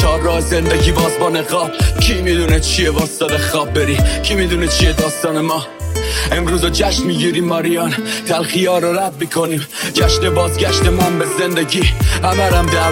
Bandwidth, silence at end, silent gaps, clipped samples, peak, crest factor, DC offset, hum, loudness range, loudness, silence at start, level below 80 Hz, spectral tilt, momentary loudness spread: 17 kHz; 0 s; none; under 0.1%; 0 dBFS; 14 dB; under 0.1%; none; 2 LU; -15 LUFS; 0 s; -22 dBFS; -4.5 dB/octave; 5 LU